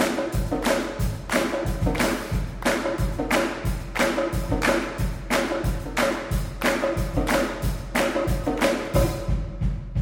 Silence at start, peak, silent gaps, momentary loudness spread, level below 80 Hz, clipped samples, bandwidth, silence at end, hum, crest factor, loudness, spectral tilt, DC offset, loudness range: 0 s; -6 dBFS; none; 6 LU; -32 dBFS; under 0.1%; 18.5 kHz; 0 s; none; 18 dB; -25 LUFS; -5 dB/octave; under 0.1%; 1 LU